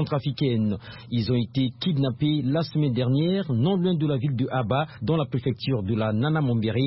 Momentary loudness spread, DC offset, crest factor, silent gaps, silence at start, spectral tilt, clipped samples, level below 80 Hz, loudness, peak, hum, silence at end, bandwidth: 4 LU; under 0.1%; 12 dB; none; 0 s; -11.5 dB/octave; under 0.1%; -54 dBFS; -25 LUFS; -12 dBFS; none; 0 s; 5.8 kHz